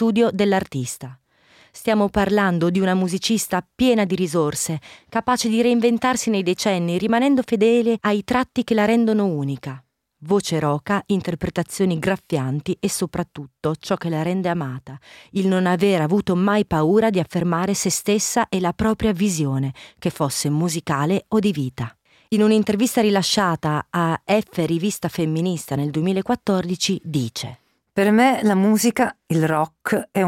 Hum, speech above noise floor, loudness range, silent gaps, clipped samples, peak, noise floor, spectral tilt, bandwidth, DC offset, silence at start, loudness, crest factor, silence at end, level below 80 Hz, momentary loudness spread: none; 35 dB; 4 LU; none; under 0.1%; -6 dBFS; -54 dBFS; -5 dB/octave; 16.5 kHz; under 0.1%; 0 s; -20 LUFS; 14 dB; 0 s; -50 dBFS; 9 LU